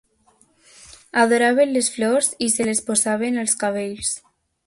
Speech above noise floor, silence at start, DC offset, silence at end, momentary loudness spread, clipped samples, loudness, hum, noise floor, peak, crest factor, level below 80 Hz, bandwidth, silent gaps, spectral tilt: 40 dB; 1.15 s; under 0.1%; 0.5 s; 8 LU; under 0.1%; -19 LUFS; none; -59 dBFS; -2 dBFS; 18 dB; -60 dBFS; 12 kHz; none; -2.5 dB/octave